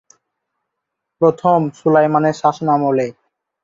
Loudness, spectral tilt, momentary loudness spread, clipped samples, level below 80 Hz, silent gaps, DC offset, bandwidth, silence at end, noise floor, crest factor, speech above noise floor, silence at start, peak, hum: -16 LUFS; -7.5 dB/octave; 5 LU; under 0.1%; -62 dBFS; none; under 0.1%; 7.8 kHz; 0.5 s; -78 dBFS; 16 dB; 64 dB; 1.2 s; -2 dBFS; none